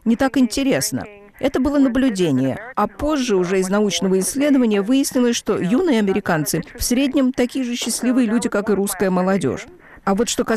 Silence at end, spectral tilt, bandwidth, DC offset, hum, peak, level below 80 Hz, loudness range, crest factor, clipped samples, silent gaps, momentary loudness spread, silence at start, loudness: 0 s; -4.5 dB/octave; 15 kHz; under 0.1%; none; -8 dBFS; -42 dBFS; 2 LU; 10 dB; under 0.1%; none; 6 LU; 0.05 s; -19 LUFS